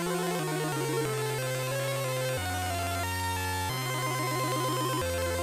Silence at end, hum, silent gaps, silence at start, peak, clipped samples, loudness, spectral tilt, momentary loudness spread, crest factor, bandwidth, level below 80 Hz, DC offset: 0 s; none; none; 0 s; -20 dBFS; under 0.1%; -30 LUFS; -4 dB/octave; 2 LU; 12 dB; 19.5 kHz; -54 dBFS; under 0.1%